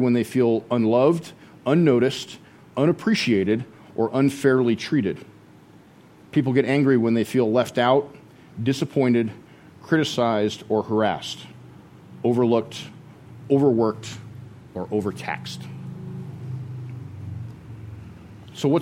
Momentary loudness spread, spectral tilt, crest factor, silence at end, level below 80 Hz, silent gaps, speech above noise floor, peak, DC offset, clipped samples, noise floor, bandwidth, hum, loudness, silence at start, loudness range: 20 LU; -6.5 dB/octave; 18 dB; 0 s; -60 dBFS; none; 29 dB; -4 dBFS; under 0.1%; under 0.1%; -49 dBFS; 16 kHz; none; -22 LUFS; 0 s; 10 LU